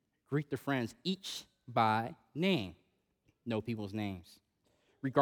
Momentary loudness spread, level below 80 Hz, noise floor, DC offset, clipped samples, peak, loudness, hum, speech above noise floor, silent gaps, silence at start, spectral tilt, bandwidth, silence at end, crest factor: 12 LU; -76 dBFS; -76 dBFS; under 0.1%; under 0.1%; -14 dBFS; -36 LUFS; none; 40 dB; none; 0.3 s; -6 dB/octave; over 20 kHz; 0 s; 22 dB